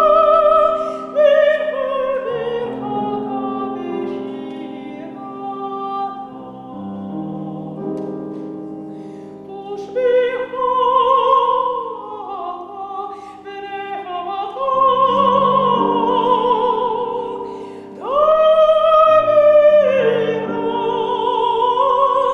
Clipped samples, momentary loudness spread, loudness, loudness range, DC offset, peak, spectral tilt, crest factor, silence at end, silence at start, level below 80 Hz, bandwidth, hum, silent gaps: under 0.1%; 19 LU; -16 LUFS; 14 LU; under 0.1%; -2 dBFS; -6.5 dB/octave; 16 dB; 0 s; 0 s; -54 dBFS; 6.6 kHz; none; none